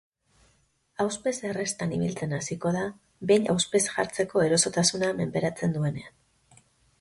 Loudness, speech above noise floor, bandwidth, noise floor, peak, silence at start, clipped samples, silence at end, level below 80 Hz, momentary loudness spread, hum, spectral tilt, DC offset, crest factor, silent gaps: -27 LUFS; 41 dB; 11.5 kHz; -67 dBFS; -8 dBFS; 1 s; under 0.1%; 0.9 s; -60 dBFS; 9 LU; none; -4 dB/octave; under 0.1%; 20 dB; none